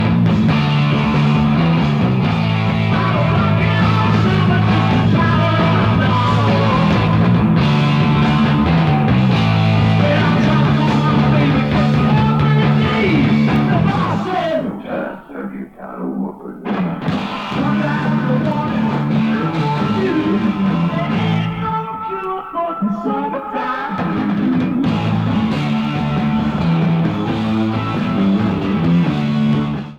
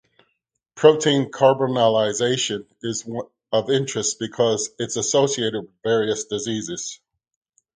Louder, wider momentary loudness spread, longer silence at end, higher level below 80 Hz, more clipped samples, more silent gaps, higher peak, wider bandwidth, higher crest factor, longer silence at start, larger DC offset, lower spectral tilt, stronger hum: first, -16 LUFS vs -21 LUFS; second, 8 LU vs 11 LU; second, 0 s vs 0.8 s; first, -36 dBFS vs -64 dBFS; neither; neither; second, -4 dBFS vs 0 dBFS; second, 7.8 kHz vs 9.6 kHz; second, 12 dB vs 22 dB; second, 0 s vs 0.75 s; neither; first, -8 dB/octave vs -3.5 dB/octave; neither